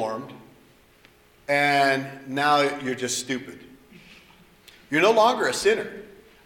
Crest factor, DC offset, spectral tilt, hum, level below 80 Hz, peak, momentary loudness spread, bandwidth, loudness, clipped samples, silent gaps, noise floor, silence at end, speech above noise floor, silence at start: 20 dB; under 0.1%; -3 dB/octave; none; -64 dBFS; -6 dBFS; 18 LU; 18.5 kHz; -22 LUFS; under 0.1%; none; -56 dBFS; 0.35 s; 33 dB; 0 s